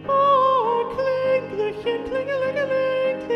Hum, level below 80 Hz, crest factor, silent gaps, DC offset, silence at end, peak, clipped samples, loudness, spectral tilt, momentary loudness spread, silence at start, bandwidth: none; -56 dBFS; 14 dB; none; under 0.1%; 0 s; -8 dBFS; under 0.1%; -21 LUFS; -6 dB/octave; 8 LU; 0 s; 6.6 kHz